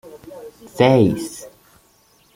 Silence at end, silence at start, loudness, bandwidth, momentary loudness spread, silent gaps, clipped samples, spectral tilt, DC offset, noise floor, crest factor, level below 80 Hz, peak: 0.9 s; 0.05 s; -16 LUFS; 16.5 kHz; 25 LU; none; under 0.1%; -6.5 dB/octave; under 0.1%; -56 dBFS; 20 dB; -54 dBFS; -2 dBFS